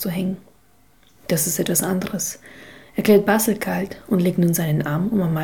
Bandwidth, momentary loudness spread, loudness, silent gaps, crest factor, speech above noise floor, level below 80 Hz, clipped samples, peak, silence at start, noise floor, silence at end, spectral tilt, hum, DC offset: 19 kHz; 11 LU; -20 LUFS; none; 18 dB; 37 dB; -54 dBFS; under 0.1%; -4 dBFS; 0 s; -57 dBFS; 0 s; -5 dB/octave; none; 0.3%